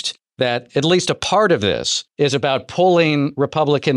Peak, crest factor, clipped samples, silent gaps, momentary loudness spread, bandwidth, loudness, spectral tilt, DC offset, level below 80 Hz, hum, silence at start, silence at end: -4 dBFS; 14 dB; under 0.1%; none; 6 LU; 11.5 kHz; -17 LUFS; -4.5 dB/octave; under 0.1%; -54 dBFS; none; 0 s; 0 s